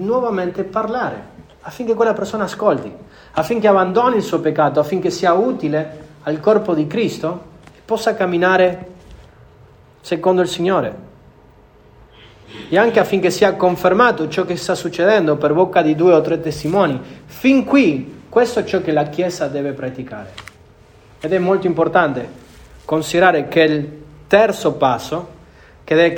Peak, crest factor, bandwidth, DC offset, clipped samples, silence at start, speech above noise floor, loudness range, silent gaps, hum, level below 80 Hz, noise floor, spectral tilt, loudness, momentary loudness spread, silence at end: 0 dBFS; 16 dB; 19 kHz; under 0.1%; under 0.1%; 0 s; 31 dB; 6 LU; none; none; -50 dBFS; -47 dBFS; -6 dB/octave; -17 LUFS; 14 LU; 0 s